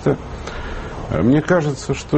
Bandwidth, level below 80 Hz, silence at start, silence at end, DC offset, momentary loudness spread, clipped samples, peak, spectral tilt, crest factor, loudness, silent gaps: 8.6 kHz; -34 dBFS; 0 s; 0 s; under 0.1%; 14 LU; under 0.1%; -4 dBFS; -7 dB/octave; 14 dB; -20 LUFS; none